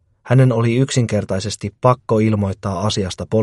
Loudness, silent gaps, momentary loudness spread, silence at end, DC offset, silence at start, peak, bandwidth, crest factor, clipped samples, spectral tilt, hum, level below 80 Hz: -18 LUFS; none; 8 LU; 0 s; under 0.1%; 0.25 s; 0 dBFS; 11.5 kHz; 16 dB; under 0.1%; -6.5 dB/octave; none; -48 dBFS